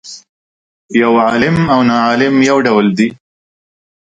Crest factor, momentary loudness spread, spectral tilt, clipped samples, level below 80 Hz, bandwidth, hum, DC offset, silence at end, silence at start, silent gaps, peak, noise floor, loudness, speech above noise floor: 14 dB; 6 LU; -6 dB/octave; under 0.1%; -46 dBFS; 9.2 kHz; none; under 0.1%; 1 s; 0.05 s; 0.29-0.89 s; 0 dBFS; under -90 dBFS; -11 LUFS; over 79 dB